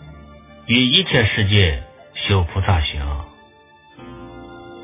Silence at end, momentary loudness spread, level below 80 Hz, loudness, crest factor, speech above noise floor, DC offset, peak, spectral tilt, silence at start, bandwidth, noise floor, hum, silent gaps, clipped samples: 0 s; 24 LU; -30 dBFS; -17 LUFS; 20 dB; 32 dB; under 0.1%; 0 dBFS; -9.5 dB/octave; 0 s; 3.9 kHz; -49 dBFS; none; none; under 0.1%